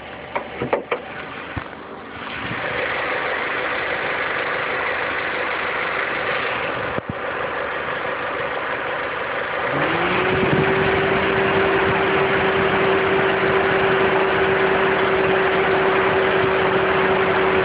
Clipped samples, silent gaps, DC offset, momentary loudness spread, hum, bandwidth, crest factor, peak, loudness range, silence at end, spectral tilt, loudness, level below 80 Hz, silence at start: under 0.1%; none; under 0.1%; 9 LU; none; 5 kHz; 16 dB; -4 dBFS; 6 LU; 0 s; -10 dB/octave; -20 LUFS; -46 dBFS; 0 s